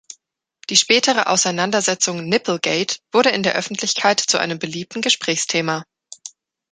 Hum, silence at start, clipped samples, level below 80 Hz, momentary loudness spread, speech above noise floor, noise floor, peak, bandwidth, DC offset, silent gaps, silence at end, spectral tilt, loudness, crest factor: none; 0.1 s; under 0.1%; -66 dBFS; 12 LU; 42 dB; -61 dBFS; 0 dBFS; 10.5 kHz; under 0.1%; none; 0.45 s; -2 dB/octave; -18 LUFS; 20 dB